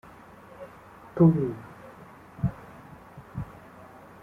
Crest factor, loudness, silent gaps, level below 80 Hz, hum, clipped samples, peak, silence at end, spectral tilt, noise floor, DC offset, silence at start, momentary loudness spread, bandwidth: 22 dB; -26 LUFS; none; -54 dBFS; none; under 0.1%; -8 dBFS; 0.7 s; -10.5 dB/octave; -49 dBFS; under 0.1%; 0.6 s; 27 LU; 3.6 kHz